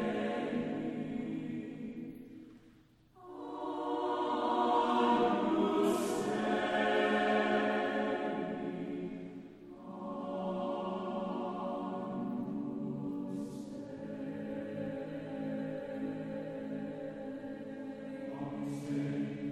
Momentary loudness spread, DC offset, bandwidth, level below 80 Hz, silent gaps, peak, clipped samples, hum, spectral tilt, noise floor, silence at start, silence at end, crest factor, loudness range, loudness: 14 LU; under 0.1%; 14 kHz; -70 dBFS; none; -18 dBFS; under 0.1%; none; -6 dB/octave; -63 dBFS; 0 s; 0 s; 18 dB; 10 LU; -36 LUFS